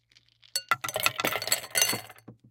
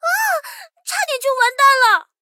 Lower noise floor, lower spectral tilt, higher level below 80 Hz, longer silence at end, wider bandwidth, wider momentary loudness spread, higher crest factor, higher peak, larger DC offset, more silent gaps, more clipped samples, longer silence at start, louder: first, -61 dBFS vs -36 dBFS; first, -0.5 dB/octave vs 5 dB/octave; first, -70 dBFS vs -80 dBFS; about the same, 0.15 s vs 0.2 s; about the same, 17 kHz vs 17 kHz; second, 9 LU vs 14 LU; first, 28 dB vs 14 dB; about the same, -2 dBFS vs -2 dBFS; neither; neither; neither; first, 0.55 s vs 0.05 s; second, -27 LUFS vs -15 LUFS